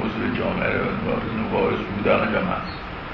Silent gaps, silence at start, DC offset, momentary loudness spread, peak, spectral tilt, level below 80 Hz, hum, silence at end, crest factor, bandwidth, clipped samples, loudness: none; 0 s; under 0.1%; 7 LU; -6 dBFS; -8.5 dB/octave; -40 dBFS; none; 0 s; 18 dB; 6 kHz; under 0.1%; -23 LUFS